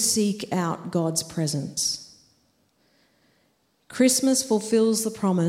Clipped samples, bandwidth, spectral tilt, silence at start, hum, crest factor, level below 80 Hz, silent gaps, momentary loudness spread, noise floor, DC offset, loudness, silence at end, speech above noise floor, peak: under 0.1%; 16 kHz; -4 dB/octave; 0 s; none; 18 dB; -64 dBFS; none; 7 LU; -67 dBFS; under 0.1%; -23 LUFS; 0 s; 44 dB; -8 dBFS